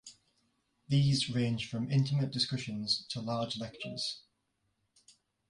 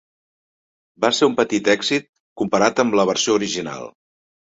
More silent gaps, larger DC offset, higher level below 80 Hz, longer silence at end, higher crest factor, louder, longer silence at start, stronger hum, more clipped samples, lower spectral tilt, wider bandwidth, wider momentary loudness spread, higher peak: second, none vs 2.09-2.13 s, 2.20-2.36 s; neither; about the same, -66 dBFS vs -62 dBFS; first, 1.3 s vs 0.7 s; about the same, 18 dB vs 20 dB; second, -33 LUFS vs -19 LUFS; second, 0.05 s vs 1 s; neither; neither; first, -5.5 dB/octave vs -3.5 dB/octave; first, 11 kHz vs 8 kHz; about the same, 9 LU vs 10 LU; second, -18 dBFS vs -2 dBFS